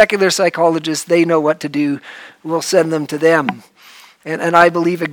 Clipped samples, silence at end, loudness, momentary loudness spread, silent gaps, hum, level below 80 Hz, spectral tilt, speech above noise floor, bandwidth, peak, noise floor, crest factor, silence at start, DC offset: 0.2%; 0 s; -15 LUFS; 14 LU; none; none; -64 dBFS; -4.5 dB/octave; 28 dB; 19 kHz; 0 dBFS; -43 dBFS; 16 dB; 0 s; under 0.1%